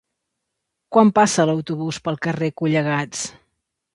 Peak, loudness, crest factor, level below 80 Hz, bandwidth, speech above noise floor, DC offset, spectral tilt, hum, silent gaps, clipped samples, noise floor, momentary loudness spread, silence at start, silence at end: 0 dBFS; -20 LUFS; 20 dB; -60 dBFS; 11.5 kHz; 60 dB; under 0.1%; -5 dB/octave; none; none; under 0.1%; -79 dBFS; 11 LU; 0.9 s; 0.65 s